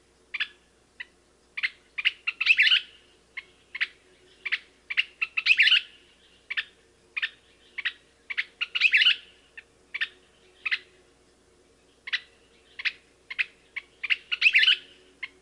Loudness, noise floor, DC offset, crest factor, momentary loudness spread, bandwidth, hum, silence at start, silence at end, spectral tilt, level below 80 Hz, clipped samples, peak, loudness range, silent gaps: -24 LUFS; -62 dBFS; under 0.1%; 22 dB; 23 LU; 11.5 kHz; none; 0.35 s; 0.15 s; 1.5 dB/octave; -70 dBFS; under 0.1%; -8 dBFS; 9 LU; none